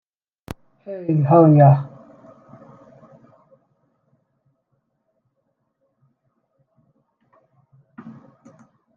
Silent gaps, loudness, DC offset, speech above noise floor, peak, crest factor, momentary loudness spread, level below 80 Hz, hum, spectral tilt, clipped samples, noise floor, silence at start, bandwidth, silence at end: none; -15 LUFS; under 0.1%; 59 dB; -2 dBFS; 20 dB; 28 LU; -60 dBFS; none; -11.5 dB/octave; under 0.1%; -72 dBFS; 0.9 s; 2.9 kHz; 0.85 s